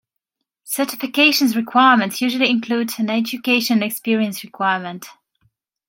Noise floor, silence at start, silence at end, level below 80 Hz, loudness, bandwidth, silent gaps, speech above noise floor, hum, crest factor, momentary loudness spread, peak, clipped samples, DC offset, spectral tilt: -79 dBFS; 0.65 s; 0.75 s; -72 dBFS; -18 LUFS; 17 kHz; none; 61 dB; none; 18 dB; 10 LU; -2 dBFS; under 0.1%; under 0.1%; -3.5 dB/octave